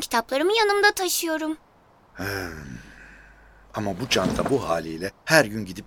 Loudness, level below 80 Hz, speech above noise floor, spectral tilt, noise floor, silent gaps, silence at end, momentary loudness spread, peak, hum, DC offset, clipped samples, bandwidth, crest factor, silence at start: -23 LUFS; -50 dBFS; 31 dB; -3.5 dB/octave; -55 dBFS; none; 0 s; 16 LU; -2 dBFS; none; under 0.1%; under 0.1%; over 20 kHz; 24 dB; 0 s